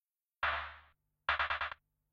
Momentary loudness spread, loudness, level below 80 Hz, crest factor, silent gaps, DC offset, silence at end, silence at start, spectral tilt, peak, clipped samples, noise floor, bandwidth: 12 LU; -37 LUFS; -58 dBFS; 22 dB; none; under 0.1%; 0.4 s; 0.4 s; -3.5 dB/octave; -18 dBFS; under 0.1%; -67 dBFS; 7.6 kHz